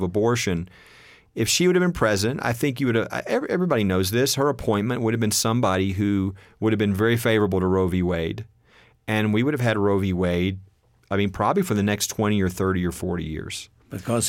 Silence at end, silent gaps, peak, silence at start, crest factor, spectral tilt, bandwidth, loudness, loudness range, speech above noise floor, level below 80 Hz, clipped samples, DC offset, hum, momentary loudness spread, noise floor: 0 s; none; -8 dBFS; 0 s; 16 dB; -5 dB/octave; 17 kHz; -23 LUFS; 2 LU; 34 dB; -48 dBFS; under 0.1%; under 0.1%; none; 10 LU; -56 dBFS